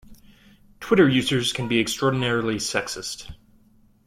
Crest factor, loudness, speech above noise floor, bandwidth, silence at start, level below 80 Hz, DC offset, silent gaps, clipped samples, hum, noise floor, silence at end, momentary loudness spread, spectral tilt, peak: 20 dB; -22 LUFS; 35 dB; 16 kHz; 0.1 s; -52 dBFS; under 0.1%; none; under 0.1%; none; -57 dBFS; 0.7 s; 16 LU; -4.5 dB/octave; -4 dBFS